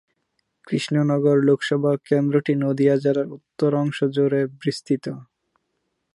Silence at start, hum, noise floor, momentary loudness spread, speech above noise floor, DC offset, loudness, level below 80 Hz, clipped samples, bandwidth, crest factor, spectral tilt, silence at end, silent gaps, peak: 0.7 s; none; -75 dBFS; 9 LU; 54 dB; under 0.1%; -21 LUFS; -72 dBFS; under 0.1%; 11.5 kHz; 16 dB; -7.5 dB/octave; 0.9 s; none; -6 dBFS